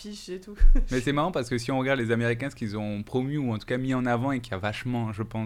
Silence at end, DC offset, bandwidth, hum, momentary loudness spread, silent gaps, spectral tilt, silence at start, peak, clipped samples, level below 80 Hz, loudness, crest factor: 0 s; under 0.1%; 11 kHz; none; 7 LU; none; -6.5 dB/octave; 0 s; -8 dBFS; under 0.1%; -28 dBFS; -28 LUFS; 18 dB